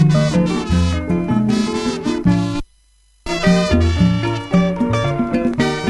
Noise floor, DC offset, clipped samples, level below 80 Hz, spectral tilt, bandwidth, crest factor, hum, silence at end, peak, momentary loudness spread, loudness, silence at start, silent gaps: -54 dBFS; under 0.1%; under 0.1%; -30 dBFS; -6.5 dB/octave; 11.5 kHz; 16 dB; none; 0 s; -2 dBFS; 6 LU; -17 LUFS; 0 s; none